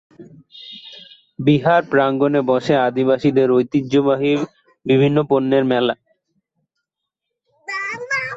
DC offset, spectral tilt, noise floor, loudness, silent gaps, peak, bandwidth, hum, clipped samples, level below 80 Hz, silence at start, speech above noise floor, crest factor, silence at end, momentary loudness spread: under 0.1%; -7 dB/octave; -81 dBFS; -17 LUFS; none; -2 dBFS; 7.8 kHz; none; under 0.1%; -60 dBFS; 0.2 s; 65 dB; 16 dB; 0 s; 19 LU